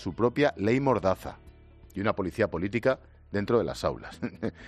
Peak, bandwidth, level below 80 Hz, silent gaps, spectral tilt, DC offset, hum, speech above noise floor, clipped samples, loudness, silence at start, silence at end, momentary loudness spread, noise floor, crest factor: -10 dBFS; 14 kHz; -52 dBFS; none; -7 dB/octave; under 0.1%; none; 24 dB; under 0.1%; -28 LUFS; 0 s; 0 s; 10 LU; -52 dBFS; 18 dB